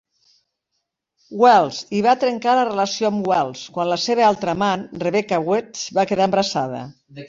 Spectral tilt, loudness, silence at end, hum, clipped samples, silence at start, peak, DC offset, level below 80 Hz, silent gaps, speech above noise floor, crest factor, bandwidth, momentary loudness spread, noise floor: -4.5 dB/octave; -19 LUFS; 0 s; none; under 0.1%; 1.3 s; -2 dBFS; under 0.1%; -62 dBFS; none; 57 dB; 18 dB; 7.8 kHz; 8 LU; -76 dBFS